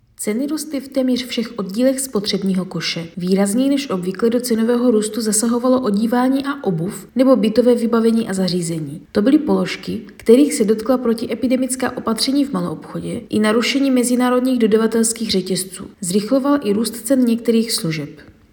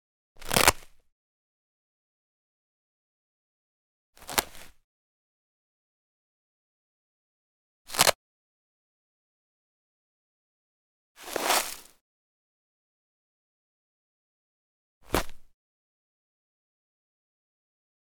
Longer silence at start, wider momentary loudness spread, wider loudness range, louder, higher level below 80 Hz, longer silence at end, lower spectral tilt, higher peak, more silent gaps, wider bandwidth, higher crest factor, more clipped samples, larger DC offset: second, 0.2 s vs 0.4 s; second, 9 LU vs 24 LU; second, 2 LU vs 9 LU; first, -18 LUFS vs -26 LUFS; about the same, -54 dBFS vs -52 dBFS; second, 0.3 s vs 2.75 s; first, -4.5 dB/octave vs -1.5 dB/octave; about the same, 0 dBFS vs 0 dBFS; second, none vs 1.12-4.13 s, 4.84-7.85 s, 8.15-11.15 s, 12.01-15.01 s; about the same, 19.5 kHz vs 19.5 kHz; second, 18 dB vs 36 dB; neither; neither